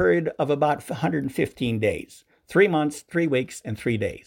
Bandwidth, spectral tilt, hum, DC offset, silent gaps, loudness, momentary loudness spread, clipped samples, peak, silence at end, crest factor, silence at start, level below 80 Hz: 17 kHz; -6.5 dB/octave; none; under 0.1%; none; -24 LUFS; 7 LU; under 0.1%; -6 dBFS; 0.05 s; 18 dB; 0 s; -54 dBFS